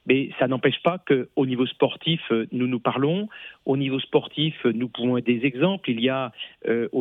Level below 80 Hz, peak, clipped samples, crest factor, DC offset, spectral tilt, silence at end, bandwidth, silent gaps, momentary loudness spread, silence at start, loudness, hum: -72 dBFS; -6 dBFS; under 0.1%; 16 dB; under 0.1%; -9 dB/octave; 0 s; 4 kHz; none; 5 LU; 0.05 s; -24 LUFS; none